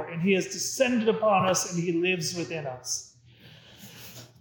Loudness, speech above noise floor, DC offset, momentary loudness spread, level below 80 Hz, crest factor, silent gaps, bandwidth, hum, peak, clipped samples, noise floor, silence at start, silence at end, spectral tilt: -26 LUFS; 26 dB; under 0.1%; 20 LU; -70 dBFS; 18 dB; none; 19 kHz; none; -10 dBFS; under 0.1%; -53 dBFS; 0 s; 0.15 s; -4 dB/octave